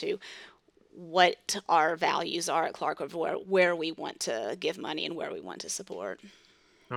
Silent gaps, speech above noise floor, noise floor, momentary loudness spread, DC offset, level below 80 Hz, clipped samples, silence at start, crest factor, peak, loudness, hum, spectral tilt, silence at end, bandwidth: none; 32 dB; -62 dBFS; 14 LU; under 0.1%; -78 dBFS; under 0.1%; 0 s; 24 dB; -6 dBFS; -30 LUFS; none; -2.5 dB/octave; 0 s; 18 kHz